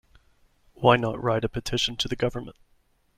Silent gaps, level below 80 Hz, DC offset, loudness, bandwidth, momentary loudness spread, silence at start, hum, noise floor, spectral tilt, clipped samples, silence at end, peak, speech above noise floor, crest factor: none; -48 dBFS; under 0.1%; -25 LUFS; 15 kHz; 10 LU; 0.8 s; none; -62 dBFS; -5 dB/octave; under 0.1%; 0.65 s; -4 dBFS; 37 dB; 24 dB